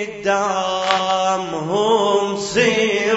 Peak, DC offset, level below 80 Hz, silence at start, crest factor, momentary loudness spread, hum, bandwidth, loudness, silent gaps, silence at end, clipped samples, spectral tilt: 0 dBFS; under 0.1%; -54 dBFS; 0 s; 18 dB; 4 LU; none; 8 kHz; -18 LUFS; none; 0 s; under 0.1%; -3.5 dB/octave